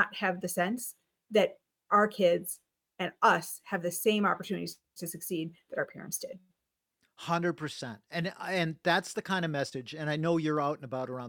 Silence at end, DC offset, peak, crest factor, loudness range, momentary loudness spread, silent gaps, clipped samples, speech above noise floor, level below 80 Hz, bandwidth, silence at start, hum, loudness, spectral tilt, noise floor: 0 s; under 0.1%; -12 dBFS; 20 dB; 7 LU; 12 LU; none; under 0.1%; 54 dB; -78 dBFS; 19.5 kHz; 0 s; none; -31 LUFS; -4.5 dB/octave; -85 dBFS